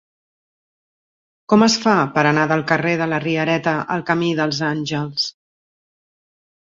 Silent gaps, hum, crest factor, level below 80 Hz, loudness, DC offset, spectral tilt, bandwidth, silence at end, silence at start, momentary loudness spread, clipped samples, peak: none; none; 18 dB; -60 dBFS; -18 LUFS; under 0.1%; -5 dB/octave; 7.8 kHz; 1.4 s; 1.5 s; 8 LU; under 0.1%; -2 dBFS